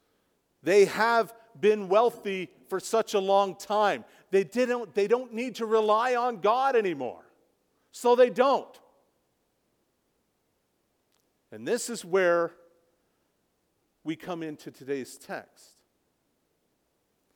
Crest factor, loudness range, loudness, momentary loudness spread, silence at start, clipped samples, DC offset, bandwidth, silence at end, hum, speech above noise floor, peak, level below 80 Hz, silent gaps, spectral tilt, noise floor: 18 dB; 14 LU; -26 LUFS; 15 LU; 0.65 s; under 0.1%; under 0.1%; 18 kHz; 1.95 s; none; 49 dB; -10 dBFS; -80 dBFS; none; -4 dB/octave; -75 dBFS